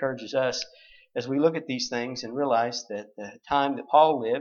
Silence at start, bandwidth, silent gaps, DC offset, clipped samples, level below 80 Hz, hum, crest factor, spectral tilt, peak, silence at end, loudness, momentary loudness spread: 0 s; 7.2 kHz; none; under 0.1%; under 0.1%; -66 dBFS; none; 20 dB; -4.5 dB/octave; -6 dBFS; 0 s; -26 LUFS; 16 LU